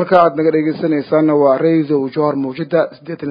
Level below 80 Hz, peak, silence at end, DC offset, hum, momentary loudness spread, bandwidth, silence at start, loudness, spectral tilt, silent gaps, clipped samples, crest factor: -62 dBFS; 0 dBFS; 0 s; under 0.1%; none; 6 LU; 5.2 kHz; 0 s; -15 LUFS; -10 dB/octave; none; under 0.1%; 14 dB